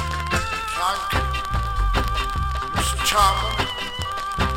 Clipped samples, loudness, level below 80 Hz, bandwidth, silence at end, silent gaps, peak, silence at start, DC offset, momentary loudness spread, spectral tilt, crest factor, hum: under 0.1%; -22 LUFS; -28 dBFS; 17 kHz; 0 s; none; -4 dBFS; 0 s; under 0.1%; 7 LU; -3.5 dB/octave; 18 dB; none